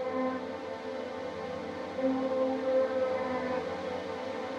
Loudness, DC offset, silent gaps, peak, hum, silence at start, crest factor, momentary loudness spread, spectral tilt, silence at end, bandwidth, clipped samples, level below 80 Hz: -33 LUFS; under 0.1%; none; -18 dBFS; none; 0 s; 14 dB; 9 LU; -6 dB/octave; 0 s; 8.8 kHz; under 0.1%; -68 dBFS